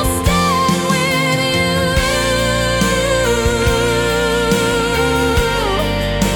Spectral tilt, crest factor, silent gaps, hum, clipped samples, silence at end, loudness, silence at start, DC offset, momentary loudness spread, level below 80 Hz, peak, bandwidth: -4 dB/octave; 12 dB; none; none; under 0.1%; 0 s; -15 LUFS; 0 s; under 0.1%; 1 LU; -26 dBFS; -2 dBFS; 18 kHz